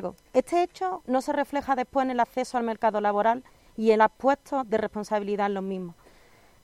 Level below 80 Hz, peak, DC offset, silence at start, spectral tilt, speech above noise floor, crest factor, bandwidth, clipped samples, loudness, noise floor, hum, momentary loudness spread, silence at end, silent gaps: -60 dBFS; -8 dBFS; under 0.1%; 0 s; -5.5 dB/octave; 31 dB; 20 dB; 15.5 kHz; under 0.1%; -26 LUFS; -57 dBFS; none; 9 LU; 0.7 s; none